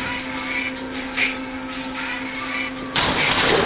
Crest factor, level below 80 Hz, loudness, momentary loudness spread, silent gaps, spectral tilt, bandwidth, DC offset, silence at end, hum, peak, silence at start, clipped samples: 18 dB; -44 dBFS; -23 LUFS; 11 LU; none; -1.5 dB/octave; 4 kHz; under 0.1%; 0 s; none; -4 dBFS; 0 s; under 0.1%